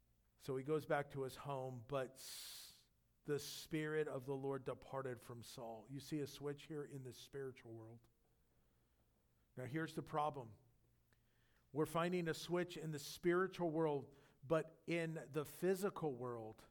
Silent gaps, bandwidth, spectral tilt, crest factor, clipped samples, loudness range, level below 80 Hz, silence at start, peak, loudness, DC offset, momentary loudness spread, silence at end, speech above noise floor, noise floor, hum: none; 19 kHz; -5.5 dB/octave; 20 dB; under 0.1%; 9 LU; -76 dBFS; 0.4 s; -26 dBFS; -45 LUFS; under 0.1%; 14 LU; 0.05 s; 34 dB; -78 dBFS; none